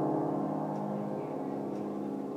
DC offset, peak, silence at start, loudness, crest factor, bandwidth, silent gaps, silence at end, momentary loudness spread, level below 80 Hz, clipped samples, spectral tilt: under 0.1%; -20 dBFS; 0 s; -35 LUFS; 14 dB; 15 kHz; none; 0 s; 5 LU; -82 dBFS; under 0.1%; -9.5 dB/octave